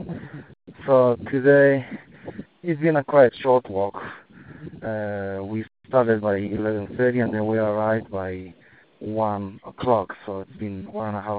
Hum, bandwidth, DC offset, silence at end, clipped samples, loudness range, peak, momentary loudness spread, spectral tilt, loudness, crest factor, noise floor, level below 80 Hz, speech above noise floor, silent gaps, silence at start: none; 4.7 kHz; under 0.1%; 0 s; under 0.1%; 6 LU; -2 dBFS; 20 LU; -6.5 dB/octave; -22 LUFS; 20 dB; -44 dBFS; -58 dBFS; 23 dB; none; 0 s